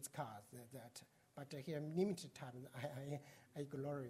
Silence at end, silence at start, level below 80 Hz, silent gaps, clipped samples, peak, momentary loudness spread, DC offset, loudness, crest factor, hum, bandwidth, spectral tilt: 0 s; 0 s; -84 dBFS; none; under 0.1%; -28 dBFS; 16 LU; under 0.1%; -49 LUFS; 20 dB; none; 16 kHz; -6 dB/octave